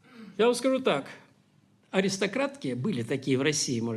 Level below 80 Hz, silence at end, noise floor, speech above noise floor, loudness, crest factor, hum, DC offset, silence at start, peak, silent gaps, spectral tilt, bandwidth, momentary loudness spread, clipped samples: -72 dBFS; 0 s; -63 dBFS; 36 dB; -28 LUFS; 18 dB; none; under 0.1%; 0.15 s; -10 dBFS; none; -4.5 dB/octave; 13.5 kHz; 7 LU; under 0.1%